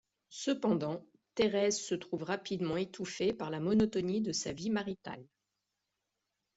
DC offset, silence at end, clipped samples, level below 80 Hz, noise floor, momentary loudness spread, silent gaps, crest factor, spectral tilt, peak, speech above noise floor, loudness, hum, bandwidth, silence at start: under 0.1%; 1.35 s; under 0.1%; -66 dBFS; -86 dBFS; 13 LU; none; 18 dB; -4.5 dB/octave; -16 dBFS; 53 dB; -34 LUFS; none; 8.2 kHz; 0.3 s